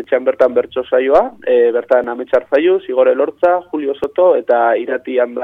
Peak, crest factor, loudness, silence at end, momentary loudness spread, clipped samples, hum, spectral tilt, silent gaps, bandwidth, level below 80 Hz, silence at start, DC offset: -2 dBFS; 12 dB; -14 LUFS; 0 s; 5 LU; under 0.1%; none; -6.5 dB/octave; none; 4.8 kHz; -52 dBFS; 0 s; under 0.1%